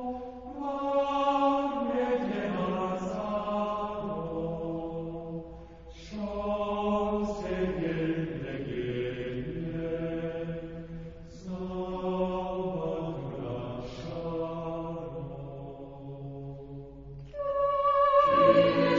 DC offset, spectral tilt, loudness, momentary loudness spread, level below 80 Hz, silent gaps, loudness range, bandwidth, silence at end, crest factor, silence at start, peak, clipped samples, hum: 0.1%; -7.5 dB/octave; -30 LUFS; 17 LU; -52 dBFS; none; 8 LU; 7.6 kHz; 0 s; 22 dB; 0 s; -8 dBFS; under 0.1%; none